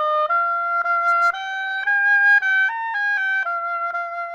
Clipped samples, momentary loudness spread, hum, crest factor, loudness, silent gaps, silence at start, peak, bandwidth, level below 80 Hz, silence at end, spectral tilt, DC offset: under 0.1%; 10 LU; none; 12 dB; -19 LUFS; none; 0 s; -8 dBFS; 8.8 kHz; -72 dBFS; 0 s; 1.5 dB/octave; under 0.1%